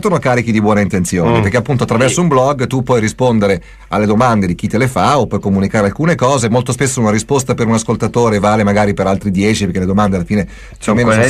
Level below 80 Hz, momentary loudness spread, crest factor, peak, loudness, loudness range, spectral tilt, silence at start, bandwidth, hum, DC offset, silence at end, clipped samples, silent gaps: -36 dBFS; 4 LU; 12 dB; 0 dBFS; -13 LUFS; 1 LU; -6 dB/octave; 0 s; 14 kHz; none; under 0.1%; 0 s; under 0.1%; none